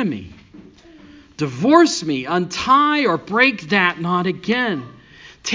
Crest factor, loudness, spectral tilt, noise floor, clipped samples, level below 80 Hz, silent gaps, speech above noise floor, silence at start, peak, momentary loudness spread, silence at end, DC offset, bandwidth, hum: 18 dB; -17 LUFS; -4.5 dB/octave; -44 dBFS; under 0.1%; -54 dBFS; none; 27 dB; 0 s; 0 dBFS; 13 LU; 0 s; under 0.1%; 7.6 kHz; none